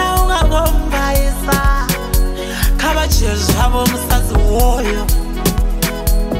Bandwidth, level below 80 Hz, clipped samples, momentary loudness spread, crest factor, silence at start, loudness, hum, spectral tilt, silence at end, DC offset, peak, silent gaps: 16.5 kHz; -16 dBFS; under 0.1%; 4 LU; 12 dB; 0 s; -16 LUFS; none; -4.5 dB/octave; 0 s; under 0.1%; -2 dBFS; none